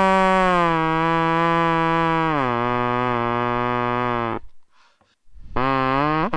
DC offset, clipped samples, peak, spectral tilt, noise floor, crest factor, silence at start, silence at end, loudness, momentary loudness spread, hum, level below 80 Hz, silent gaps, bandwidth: under 0.1%; under 0.1%; -4 dBFS; -7 dB/octave; -58 dBFS; 18 dB; 0 s; 0 s; -20 LUFS; 6 LU; none; -40 dBFS; none; 10 kHz